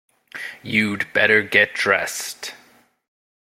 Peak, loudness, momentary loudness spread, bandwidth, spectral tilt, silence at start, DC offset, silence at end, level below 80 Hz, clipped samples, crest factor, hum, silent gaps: 0 dBFS; -18 LUFS; 18 LU; 16.5 kHz; -3 dB/octave; 0.35 s; under 0.1%; 0.9 s; -64 dBFS; under 0.1%; 22 dB; none; none